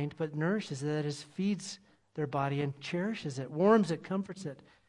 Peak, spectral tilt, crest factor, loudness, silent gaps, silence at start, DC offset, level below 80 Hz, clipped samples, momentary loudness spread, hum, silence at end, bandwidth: -12 dBFS; -6.5 dB/octave; 22 dB; -33 LUFS; none; 0 s; under 0.1%; -74 dBFS; under 0.1%; 16 LU; none; 0.3 s; 11 kHz